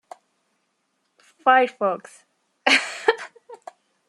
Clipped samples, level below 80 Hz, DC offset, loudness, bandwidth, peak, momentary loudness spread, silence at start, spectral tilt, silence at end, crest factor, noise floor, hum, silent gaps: under 0.1%; -80 dBFS; under 0.1%; -20 LUFS; 12 kHz; -2 dBFS; 16 LU; 1.45 s; -1.5 dB/octave; 0.55 s; 22 dB; -72 dBFS; none; none